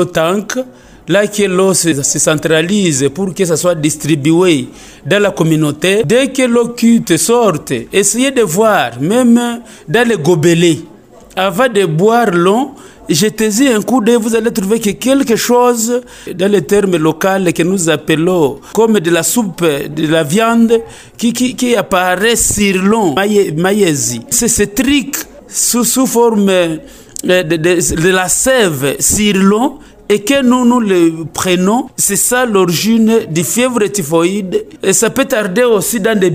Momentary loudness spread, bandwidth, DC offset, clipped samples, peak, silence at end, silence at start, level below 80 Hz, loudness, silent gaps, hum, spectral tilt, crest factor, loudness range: 6 LU; 16.5 kHz; under 0.1%; under 0.1%; 0 dBFS; 0 s; 0 s; -42 dBFS; -11 LUFS; none; none; -4 dB/octave; 12 dB; 1 LU